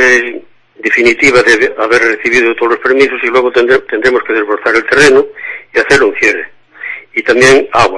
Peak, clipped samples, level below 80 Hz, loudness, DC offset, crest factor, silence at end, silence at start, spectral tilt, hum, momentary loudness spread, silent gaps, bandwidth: 0 dBFS; 0.7%; -42 dBFS; -9 LUFS; under 0.1%; 10 dB; 0 s; 0 s; -3.5 dB/octave; none; 13 LU; none; 11 kHz